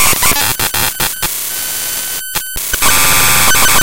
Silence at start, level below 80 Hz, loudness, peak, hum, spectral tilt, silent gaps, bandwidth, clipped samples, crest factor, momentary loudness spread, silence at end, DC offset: 0 s; -30 dBFS; -11 LUFS; 0 dBFS; none; -0.5 dB/octave; none; over 20 kHz; 0.7%; 14 dB; 9 LU; 0 s; under 0.1%